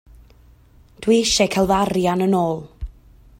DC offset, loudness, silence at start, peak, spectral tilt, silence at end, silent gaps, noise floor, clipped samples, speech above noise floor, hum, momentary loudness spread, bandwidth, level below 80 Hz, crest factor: under 0.1%; -19 LUFS; 1 s; -4 dBFS; -4.5 dB/octave; 0.5 s; none; -50 dBFS; under 0.1%; 32 dB; none; 20 LU; 16 kHz; -40 dBFS; 16 dB